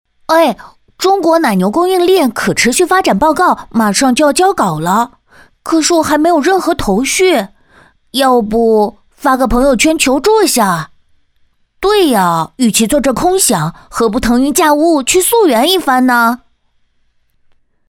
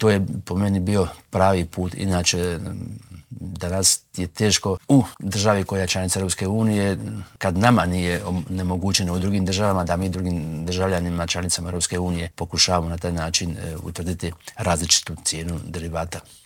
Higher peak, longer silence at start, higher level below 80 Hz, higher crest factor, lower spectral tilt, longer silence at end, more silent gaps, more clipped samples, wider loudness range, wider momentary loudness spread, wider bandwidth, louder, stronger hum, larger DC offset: about the same, 0 dBFS vs 0 dBFS; first, 0.3 s vs 0 s; first, -34 dBFS vs -46 dBFS; second, 12 dB vs 22 dB; about the same, -3.5 dB/octave vs -4 dB/octave; first, 1.55 s vs 0.1 s; neither; neither; about the same, 2 LU vs 3 LU; second, 6 LU vs 12 LU; about the same, 18.5 kHz vs 17.5 kHz; first, -11 LUFS vs -22 LUFS; neither; neither